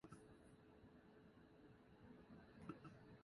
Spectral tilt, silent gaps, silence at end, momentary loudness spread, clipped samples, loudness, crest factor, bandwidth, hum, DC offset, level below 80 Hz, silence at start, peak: -7 dB/octave; none; 0 s; 9 LU; under 0.1%; -65 LUFS; 24 dB; 11 kHz; none; under 0.1%; -78 dBFS; 0 s; -38 dBFS